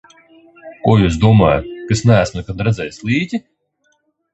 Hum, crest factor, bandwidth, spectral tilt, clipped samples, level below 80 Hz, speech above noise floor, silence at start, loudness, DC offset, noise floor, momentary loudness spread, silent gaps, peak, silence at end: none; 16 dB; 8.2 kHz; -7 dB/octave; under 0.1%; -34 dBFS; 49 dB; 0.65 s; -15 LUFS; under 0.1%; -63 dBFS; 10 LU; none; 0 dBFS; 0.95 s